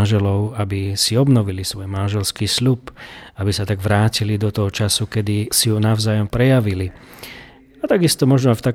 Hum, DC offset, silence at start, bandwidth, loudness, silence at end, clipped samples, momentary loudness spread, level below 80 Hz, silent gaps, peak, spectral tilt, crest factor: none; under 0.1%; 0 s; 16.5 kHz; -18 LUFS; 0 s; under 0.1%; 13 LU; -44 dBFS; none; -2 dBFS; -5 dB/octave; 16 dB